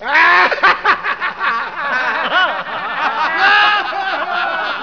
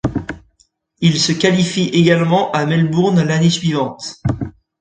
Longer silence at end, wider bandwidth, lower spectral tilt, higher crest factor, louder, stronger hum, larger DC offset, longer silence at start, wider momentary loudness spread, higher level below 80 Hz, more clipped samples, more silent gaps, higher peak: second, 0 s vs 0.3 s; second, 5.4 kHz vs 9.2 kHz; second, -2 dB/octave vs -5.5 dB/octave; about the same, 16 dB vs 16 dB; about the same, -14 LUFS vs -15 LUFS; first, 60 Hz at -50 dBFS vs none; first, 0.4% vs under 0.1%; about the same, 0 s vs 0.05 s; second, 9 LU vs 12 LU; second, -54 dBFS vs -42 dBFS; neither; neither; about the same, 0 dBFS vs 0 dBFS